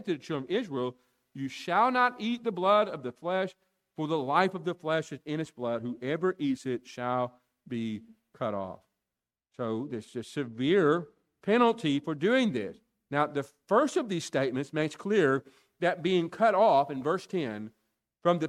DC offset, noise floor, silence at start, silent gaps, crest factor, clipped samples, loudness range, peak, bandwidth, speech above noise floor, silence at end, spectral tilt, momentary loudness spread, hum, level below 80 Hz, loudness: under 0.1%; -90 dBFS; 0 s; none; 20 dB; under 0.1%; 7 LU; -10 dBFS; 13 kHz; 61 dB; 0 s; -6 dB/octave; 13 LU; none; -74 dBFS; -29 LUFS